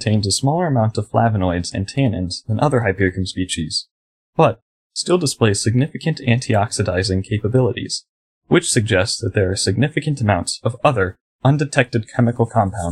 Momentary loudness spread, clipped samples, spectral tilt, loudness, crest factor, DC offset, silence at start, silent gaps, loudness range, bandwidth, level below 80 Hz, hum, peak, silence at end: 7 LU; under 0.1%; -5 dB/octave; -19 LUFS; 18 dB; under 0.1%; 0 s; 3.91-4.33 s, 4.62-4.90 s, 8.09-8.41 s, 11.20-11.39 s; 2 LU; 13 kHz; -46 dBFS; none; 0 dBFS; 0 s